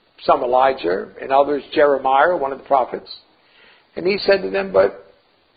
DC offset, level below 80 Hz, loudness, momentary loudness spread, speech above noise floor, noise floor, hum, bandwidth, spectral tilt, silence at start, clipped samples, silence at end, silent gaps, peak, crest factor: under 0.1%; -54 dBFS; -18 LUFS; 10 LU; 37 dB; -54 dBFS; none; 5 kHz; -9.5 dB/octave; 0.2 s; under 0.1%; 0.55 s; none; -2 dBFS; 18 dB